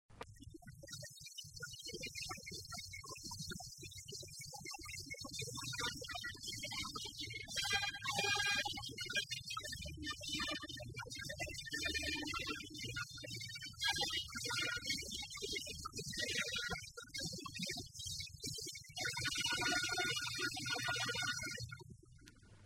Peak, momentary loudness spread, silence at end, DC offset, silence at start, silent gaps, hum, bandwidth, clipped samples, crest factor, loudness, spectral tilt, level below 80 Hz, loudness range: -20 dBFS; 13 LU; 0 s; under 0.1%; 0.1 s; none; none; 16 kHz; under 0.1%; 24 dB; -41 LUFS; -1.5 dB/octave; -62 dBFS; 9 LU